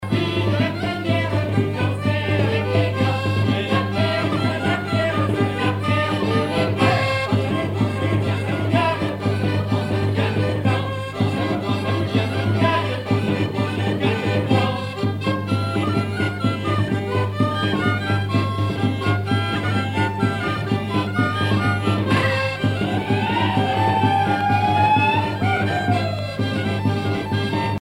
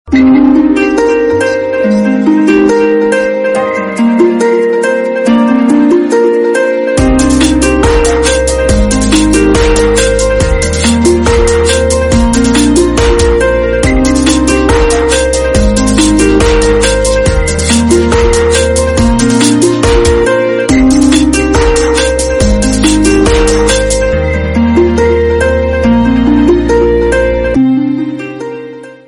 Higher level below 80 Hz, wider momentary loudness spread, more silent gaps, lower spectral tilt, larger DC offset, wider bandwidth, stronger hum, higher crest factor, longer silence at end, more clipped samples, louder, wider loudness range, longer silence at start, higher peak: second, -48 dBFS vs -16 dBFS; about the same, 4 LU vs 3 LU; neither; first, -7 dB/octave vs -5 dB/octave; neither; about the same, 12 kHz vs 12 kHz; neither; first, 16 dB vs 8 dB; about the same, 0.05 s vs 0.1 s; second, under 0.1% vs 0.2%; second, -21 LUFS vs -8 LUFS; about the same, 3 LU vs 1 LU; about the same, 0 s vs 0.05 s; second, -4 dBFS vs 0 dBFS